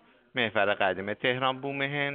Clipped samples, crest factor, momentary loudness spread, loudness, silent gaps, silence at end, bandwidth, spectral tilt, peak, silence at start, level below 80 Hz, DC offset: under 0.1%; 20 dB; 4 LU; -28 LUFS; none; 0 s; 4.7 kHz; -2 dB/octave; -10 dBFS; 0.35 s; -70 dBFS; under 0.1%